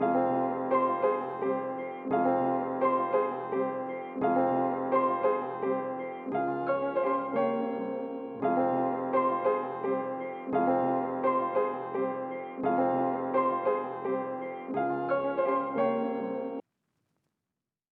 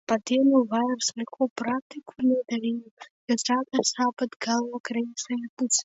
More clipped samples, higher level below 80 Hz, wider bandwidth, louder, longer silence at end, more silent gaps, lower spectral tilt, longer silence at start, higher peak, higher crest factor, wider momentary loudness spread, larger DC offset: neither; about the same, -76 dBFS vs -76 dBFS; second, 4.5 kHz vs 8 kHz; second, -30 LUFS vs -26 LUFS; first, 1.3 s vs 0 s; second, none vs 1.50-1.56 s, 1.82-1.90 s, 2.91-2.97 s, 3.10-3.28 s, 4.36-4.40 s, 4.80-4.84 s, 5.49-5.57 s; first, -10 dB/octave vs -2.5 dB/octave; about the same, 0 s vs 0.1 s; second, -14 dBFS vs -10 dBFS; about the same, 16 dB vs 18 dB; about the same, 8 LU vs 10 LU; neither